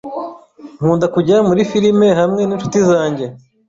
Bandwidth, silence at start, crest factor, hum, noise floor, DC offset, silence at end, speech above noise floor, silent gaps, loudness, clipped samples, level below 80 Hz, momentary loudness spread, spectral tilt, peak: 7.8 kHz; 0.05 s; 12 dB; none; -37 dBFS; under 0.1%; 0.3 s; 24 dB; none; -14 LUFS; under 0.1%; -52 dBFS; 14 LU; -6.5 dB/octave; -2 dBFS